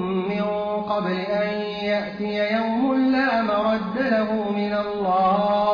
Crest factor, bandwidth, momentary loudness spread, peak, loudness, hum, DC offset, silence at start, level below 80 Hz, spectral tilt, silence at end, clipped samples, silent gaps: 12 dB; 5.2 kHz; 5 LU; -10 dBFS; -22 LUFS; none; under 0.1%; 0 s; -56 dBFS; -8 dB/octave; 0 s; under 0.1%; none